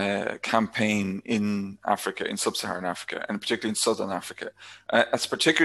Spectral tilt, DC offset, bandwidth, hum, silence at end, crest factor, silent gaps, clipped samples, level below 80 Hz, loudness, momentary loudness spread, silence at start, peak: -3.5 dB/octave; under 0.1%; 13 kHz; none; 0 s; 22 dB; none; under 0.1%; -64 dBFS; -27 LUFS; 9 LU; 0 s; -4 dBFS